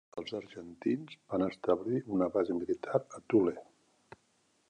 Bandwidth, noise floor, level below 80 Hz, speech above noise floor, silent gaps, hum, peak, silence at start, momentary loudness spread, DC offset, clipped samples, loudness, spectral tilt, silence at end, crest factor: 9.4 kHz; -73 dBFS; -68 dBFS; 40 dB; none; none; -14 dBFS; 0.15 s; 12 LU; under 0.1%; under 0.1%; -33 LUFS; -7.5 dB/octave; 1.05 s; 20 dB